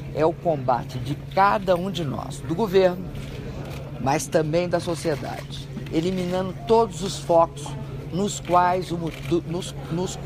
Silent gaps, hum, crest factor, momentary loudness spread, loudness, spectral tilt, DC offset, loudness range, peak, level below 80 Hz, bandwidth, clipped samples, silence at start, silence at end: none; none; 18 dB; 14 LU; -24 LUFS; -5.5 dB/octave; under 0.1%; 3 LU; -4 dBFS; -44 dBFS; 15.5 kHz; under 0.1%; 0 s; 0 s